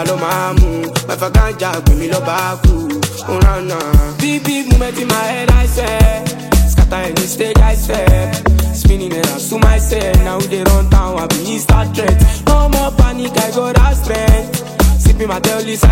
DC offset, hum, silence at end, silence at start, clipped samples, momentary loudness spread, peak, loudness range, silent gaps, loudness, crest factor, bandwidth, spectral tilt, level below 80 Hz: under 0.1%; none; 0 s; 0 s; under 0.1%; 5 LU; 0 dBFS; 2 LU; none; -13 LUFS; 12 dB; 16.5 kHz; -5.5 dB/octave; -14 dBFS